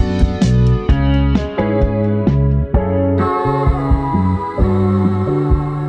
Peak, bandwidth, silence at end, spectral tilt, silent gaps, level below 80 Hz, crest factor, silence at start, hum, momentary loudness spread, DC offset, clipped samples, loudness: 0 dBFS; 8.4 kHz; 0 s; -9 dB/octave; none; -20 dBFS; 14 dB; 0 s; none; 3 LU; under 0.1%; under 0.1%; -15 LUFS